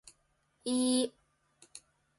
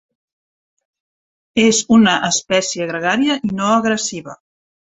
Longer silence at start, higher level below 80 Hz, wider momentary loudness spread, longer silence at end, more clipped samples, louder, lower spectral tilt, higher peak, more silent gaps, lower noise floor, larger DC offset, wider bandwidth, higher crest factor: second, 0.65 s vs 1.55 s; second, -76 dBFS vs -56 dBFS; first, 24 LU vs 9 LU; second, 0.4 s vs 0.55 s; neither; second, -32 LUFS vs -16 LUFS; about the same, -2.5 dB/octave vs -3.5 dB/octave; second, -18 dBFS vs 0 dBFS; neither; second, -74 dBFS vs under -90 dBFS; neither; first, 11.5 kHz vs 8.4 kHz; about the same, 18 dB vs 18 dB